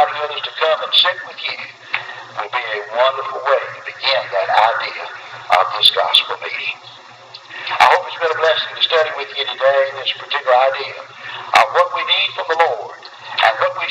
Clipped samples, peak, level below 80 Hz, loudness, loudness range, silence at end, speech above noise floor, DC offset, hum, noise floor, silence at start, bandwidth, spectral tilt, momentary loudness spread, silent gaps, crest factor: under 0.1%; 0 dBFS; -66 dBFS; -16 LUFS; 3 LU; 0 s; 22 dB; under 0.1%; none; -39 dBFS; 0 s; 17.5 kHz; -1 dB/octave; 16 LU; none; 18 dB